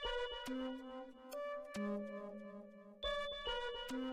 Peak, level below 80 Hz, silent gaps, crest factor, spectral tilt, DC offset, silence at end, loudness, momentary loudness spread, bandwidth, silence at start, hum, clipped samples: -30 dBFS; -60 dBFS; none; 14 dB; -4.5 dB/octave; under 0.1%; 0 s; -45 LUFS; 11 LU; 15.5 kHz; 0 s; none; under 0.1%